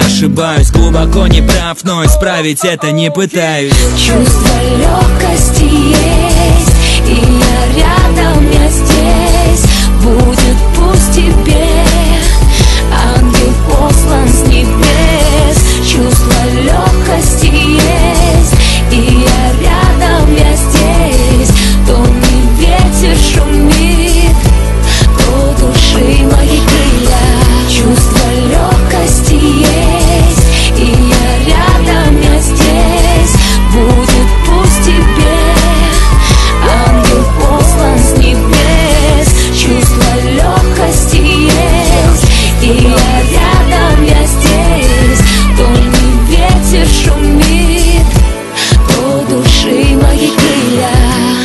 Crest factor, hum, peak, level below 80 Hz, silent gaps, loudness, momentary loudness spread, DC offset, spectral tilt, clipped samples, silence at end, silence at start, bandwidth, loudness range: 6 dB; none; 0 dBFS; -8 dBFS; none; -8 LUFS; 2 LU; under 0.1%; -5 dB/octave; 0.3%; 0 s; 0 s; 12.5 kHz; 1 LU